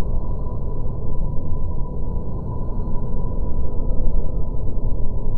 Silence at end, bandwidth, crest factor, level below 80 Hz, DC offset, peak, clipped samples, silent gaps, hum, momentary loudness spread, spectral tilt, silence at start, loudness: 0 s; 1.2 kHz; 12 dB; -22 dBFS; under 0.1%; -4 dBFS; under 0.1%; none; none; 2 LU; -13 dB/octave; 0 s; -28 LUFS